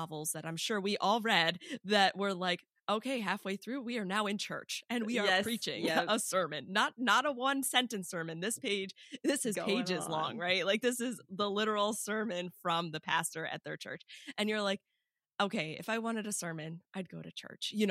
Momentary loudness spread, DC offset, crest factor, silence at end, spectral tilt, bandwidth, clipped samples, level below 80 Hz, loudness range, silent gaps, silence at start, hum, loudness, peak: 12 LU; under 0.1%; 22 dB; 0 s; -3 dB/octave; 15.5 kHz; under 0.1%; -84 dBFS; 5 LU; none; 0 s; none; -34 LUFS; -12 dBFS